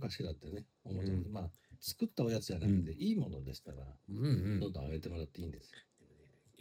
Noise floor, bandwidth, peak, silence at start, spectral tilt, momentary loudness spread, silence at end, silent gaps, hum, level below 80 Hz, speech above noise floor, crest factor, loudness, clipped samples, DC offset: -66 dBFS; 16.5 kHz; -22 dBFS; 0 s; -7 dB/octave; 15 LU; 0.8 s; none; none; -56 dBFS; 28 dB; 18 dB; -39 LUFS; under 0.1%; under 0.1%